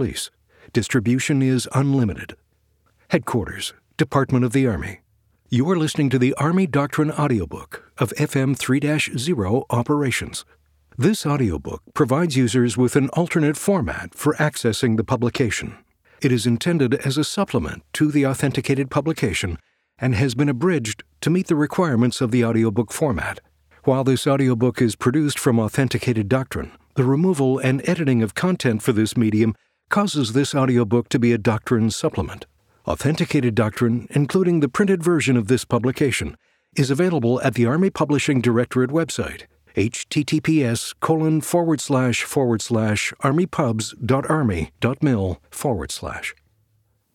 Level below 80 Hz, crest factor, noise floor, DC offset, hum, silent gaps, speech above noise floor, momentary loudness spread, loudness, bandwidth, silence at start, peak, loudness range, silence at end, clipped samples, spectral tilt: -46 dBFS; 16 dB; -65 dBFS; under 0.1%; none; none; 45 dB; 9 LU; -21 LUFS; 16.5 kHz; 0 s; -4 dBFS; 2 LU; 0.8 s; under 0.1%; -6 dB/octave